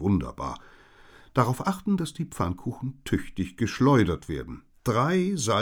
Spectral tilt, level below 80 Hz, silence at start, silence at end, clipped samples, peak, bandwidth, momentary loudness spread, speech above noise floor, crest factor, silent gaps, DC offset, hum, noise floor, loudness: -6 dB/octave; -46 dBFS; 0 s; 0 s; under 0.1%; -8 dBFS; 19 kHz; 14 LU; 27 dB; 18 dB; none; under 0.1%; none; -52 dBFS; -27 LUFS